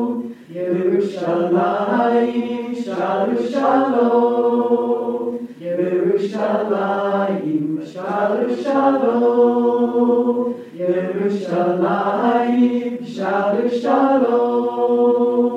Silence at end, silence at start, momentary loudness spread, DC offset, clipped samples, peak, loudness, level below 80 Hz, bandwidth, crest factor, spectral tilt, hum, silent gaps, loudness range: 0 s; 0 s; 9 LU; under 0.1%; under 0.1%; -4 dBFS; -18 LUFS; -76 dBFS; 8.2 kHz; 14 dB; -7.5 dB/octave; none; none; 2 LU